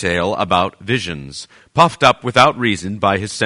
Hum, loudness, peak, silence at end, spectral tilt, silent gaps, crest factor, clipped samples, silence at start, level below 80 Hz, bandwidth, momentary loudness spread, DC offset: none; -16 LUFS; 0 dBFS; 0 s; -4.5 dB/octave; none; 16 dB; under 0.1%; 0 s; -46 dBFS; 11 kHz; 13 LU; under 0.1%